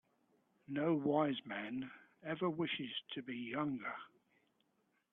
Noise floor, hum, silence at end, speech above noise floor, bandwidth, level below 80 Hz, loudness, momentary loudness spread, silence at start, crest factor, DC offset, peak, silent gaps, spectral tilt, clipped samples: -80 dBFS; none; 1.05 s; 41 dB; 4.1 kHz; -82 dBFS; -40 LUFS; 13 LU; 0.7 s; 20 dB; under 0.1%; -22 dBFS; none; -8.5 dB/octave; under 0.1%